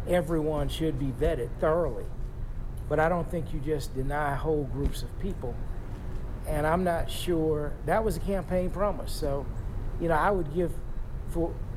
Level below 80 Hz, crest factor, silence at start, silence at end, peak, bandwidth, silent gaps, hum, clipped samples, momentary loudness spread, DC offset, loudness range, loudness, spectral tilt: -34 dBFS; 14 dB; 0 s; 0 s; -14 dBFS; 15.5 kHz; none; none; under 0.1%; 13 LU; under 0.1%; 2 LU; -30 LUFS; -6.5 dB/octave